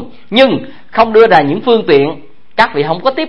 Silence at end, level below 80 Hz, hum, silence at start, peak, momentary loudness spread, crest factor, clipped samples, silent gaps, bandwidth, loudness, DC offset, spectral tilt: 0 s; -46 dBFS; none; 0 s; 0 dBFS; 12 LU; 12 dB; 0.4%; none; 7 kHz; -11 LUFS; 3%; -6.5 dB/octave